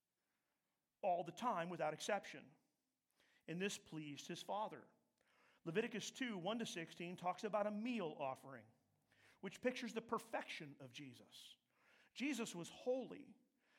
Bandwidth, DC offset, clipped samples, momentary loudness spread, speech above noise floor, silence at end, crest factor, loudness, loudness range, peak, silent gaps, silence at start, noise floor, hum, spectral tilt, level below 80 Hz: 16 kHz; under 0.1%; under 0.1%; 16 LU; over 44 dB; 0.45 s; 20 dB; -46 LUFS; 4 LU; -26 dBFS; none; 1.05 s; under -90 dBFS; none; -4 dB/octave; under -90 dBFS